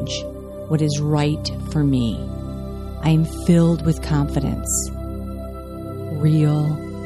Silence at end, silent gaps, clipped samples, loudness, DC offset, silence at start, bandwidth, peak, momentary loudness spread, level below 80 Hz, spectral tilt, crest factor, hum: 0 s; none; under 0.1%; -21 LUFS; under 0.1%; 0 s; 14 kHz; -4 dBFS; 14 LU; -34 dBFS; -6 dB/octave; 16 dB; none